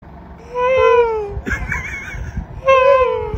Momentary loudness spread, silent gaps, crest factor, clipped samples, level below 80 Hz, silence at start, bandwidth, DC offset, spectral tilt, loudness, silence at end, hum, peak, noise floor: 16 LU; none; 16 dB; under 0.1%; -32 dBFS; 0.05 s; 7.6 kHz; under 0.1%; -5.5 dB/octave; -15 LUFS; 0 s; none; -2 dBFS; -36 dBFS